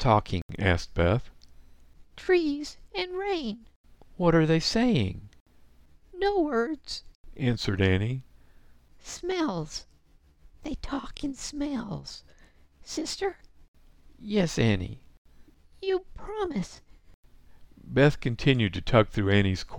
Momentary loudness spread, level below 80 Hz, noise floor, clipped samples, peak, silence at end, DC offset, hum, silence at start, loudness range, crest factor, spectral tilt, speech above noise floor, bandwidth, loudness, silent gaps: 16 LU; -44 dBFS; -59 dBFS; under 0.1%; -6 dBFS; 0 s; under 0.1%; none; 0 s; 8 LU; 24 dB; -6 dB/octave; 33 dB; 12.5 kHz; -28 LUFS; 0.42-0.49 s, 3.76-3.84 s, 5.40-5.46 s, 7.15-7.24 s, 13.68-13.74 s, 15.18-15.25 s, 17.14-17.23 s